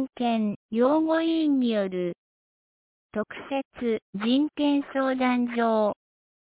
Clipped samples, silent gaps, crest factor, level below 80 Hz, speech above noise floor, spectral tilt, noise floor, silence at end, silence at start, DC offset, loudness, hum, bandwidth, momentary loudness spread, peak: under 0.1%; 0.56-0.69 s, 2.18-3.09 s, 3.65-3.71 s, 4.02-4.13 s; 14 dB; -68 dBFS; over 65 dB; -10 dB/octave; under -90 dBFS; 0.55 s; 0 s; under 0.1%; -26 LUFS; none; 4 kHz; 10 LU; -12 dBFS